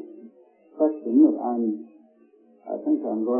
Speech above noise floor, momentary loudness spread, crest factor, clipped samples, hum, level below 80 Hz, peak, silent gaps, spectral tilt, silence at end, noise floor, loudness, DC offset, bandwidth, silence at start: 34 dB; 16 LU; 18 dB; under 0.1%; none; -84 dBFS; -6 dBFS; none; -13.5 dB/octave; 0 s; -57 dBFS; -23 LUFS; under 0.1%; 1.8 kHz; 0 s